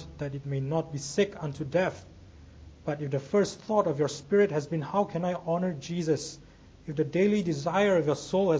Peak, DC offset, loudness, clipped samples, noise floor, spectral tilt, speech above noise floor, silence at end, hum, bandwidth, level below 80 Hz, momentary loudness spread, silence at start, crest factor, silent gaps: -12 dBFS; under 0.1%; -29 LUFS; under 0.1%; -50 dBFS; -6 dB/octave; 22 dB; 0 s; none; 8 kHz; -56 dBFS; 11 LU; 0 s; 18 dB; none